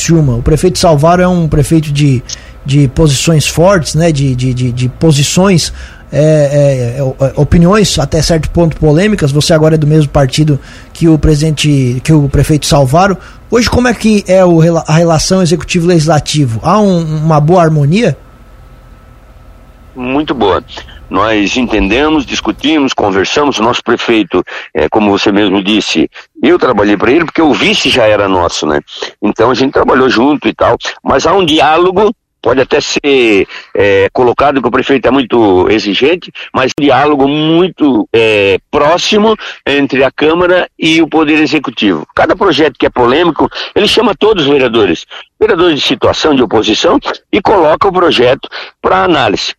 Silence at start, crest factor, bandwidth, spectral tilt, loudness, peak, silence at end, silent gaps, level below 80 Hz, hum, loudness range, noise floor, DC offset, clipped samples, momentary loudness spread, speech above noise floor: 0 s; 8 dB; 15 kHz; -5.5 dB/octave; -9 LUFS; 0 dBFS; 0.05 s; none; -28 dBFS; none; 2 LU; -36 dBFS; under 0.1%; 0.3%; 6 LU; 27 dB